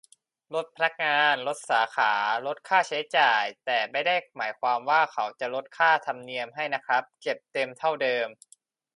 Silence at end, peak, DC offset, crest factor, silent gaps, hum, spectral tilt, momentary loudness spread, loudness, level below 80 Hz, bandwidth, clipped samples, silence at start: 0.65 s; -6 dBFS; under 0.1%; 20 dB; none; none; -2.5 dB/octave; 11 LU; -26 LUFS; -84 dBFS; 11.5 kHz; under 0.1%; 0.5 s